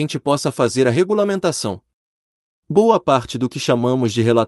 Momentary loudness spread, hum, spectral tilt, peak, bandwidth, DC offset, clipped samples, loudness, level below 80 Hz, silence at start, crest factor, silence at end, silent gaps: 8 LU; none; -5.5 dB/octave; -2 dBFS; 12 kHz; under 0.1%; under 0.1%; -18 LUFS; -56 dBFS; 0 s; 16 dB; 0 s; 1.93-2.63 s